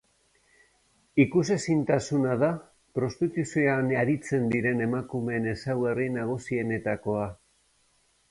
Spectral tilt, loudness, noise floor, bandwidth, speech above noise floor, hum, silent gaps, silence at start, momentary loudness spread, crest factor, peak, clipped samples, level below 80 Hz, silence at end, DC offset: -7 dB/octave; -27 LUFS; -67 dBFS; 11.5 kHz; 41 dB; none; none; 1.15 s; 7 LU; 20 dB; -8 dBFS; under 0.1%; -58 dBFS; 0.95 s; under 0.1%